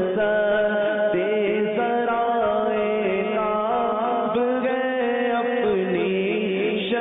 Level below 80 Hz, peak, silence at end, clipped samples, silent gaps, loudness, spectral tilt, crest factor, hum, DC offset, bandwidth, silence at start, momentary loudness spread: -58 dBFS; -12 dBFS; 0 s; under 0.1%; none; -22 LUFS; -10.5 dB/octave; 10 dB; none; under 0.1%; 4 kHz; 0 s; 2 LU